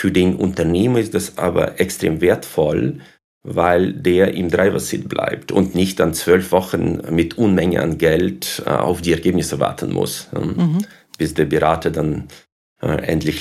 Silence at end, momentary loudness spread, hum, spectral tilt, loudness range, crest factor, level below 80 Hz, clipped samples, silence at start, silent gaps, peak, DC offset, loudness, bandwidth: 0 s; 7 LU; none; -6 dB/octave; 3 LU; 16 dB; -42 dBFS; under 0.1%; 0 s; 3.24-3.41 s, 12.52-12.76 s; 0 dBFS; under 0.1%; -18 LUFS; 15.5 kHz